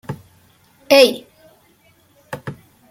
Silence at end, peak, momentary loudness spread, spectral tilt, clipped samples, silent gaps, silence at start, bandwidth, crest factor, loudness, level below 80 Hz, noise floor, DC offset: 0.4 s; 0 dBFS; 23 LU; -3.5 dB/octave; under 0.1%; none; 0.1 s; 16.5 kHz; 20 dB; -13 LUFS; -62 dBFS; -55 dBFS; under 0.1%